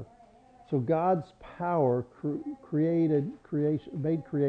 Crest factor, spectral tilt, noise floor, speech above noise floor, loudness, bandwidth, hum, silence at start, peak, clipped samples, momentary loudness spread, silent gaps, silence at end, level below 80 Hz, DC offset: 14 dB; -11 dB/octave; -57 dBFS; 28 dB; -30 LUFS; 4.9 kHz; none; 0 s; -14 dBFS; under 0.1%; 9 LU; none; 0 s; -64 dBFS; under 0.1%